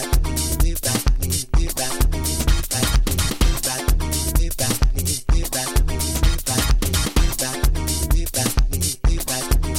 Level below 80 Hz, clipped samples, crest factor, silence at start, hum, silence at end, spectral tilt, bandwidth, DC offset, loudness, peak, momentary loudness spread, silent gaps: -20 dBFS; under 0.1%; 16 dB; 0 s; none; 0 s; -3.5 dB/octave; 17 kHz; under 0.1%; -21 LUFS; -4 dBFS; 2 LU; none